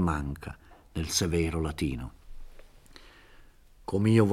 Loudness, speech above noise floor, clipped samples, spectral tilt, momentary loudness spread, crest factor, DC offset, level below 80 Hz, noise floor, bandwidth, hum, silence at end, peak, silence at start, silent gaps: -30 LUFS; 27 dB; under 0.1%; -5.5 dB/octave; 20 LU; 20 dB; under 0.1%; -44 dBFS; -54 dBFS; 15.5 kHz; none; 0 s; -10 dBFS; 0 s; none